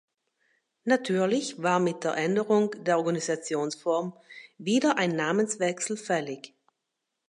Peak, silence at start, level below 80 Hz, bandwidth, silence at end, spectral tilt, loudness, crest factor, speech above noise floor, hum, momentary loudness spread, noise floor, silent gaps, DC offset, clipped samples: -10 dBFS; 0.85 s; -80 dBFS; 11.5 kHz; 0.8 s; -4.5 dB/octave; -27 LUFS; 18 dB; 56 dB; none; 12 LU; -83 dBFS; none; under 0.1%; under 0.1%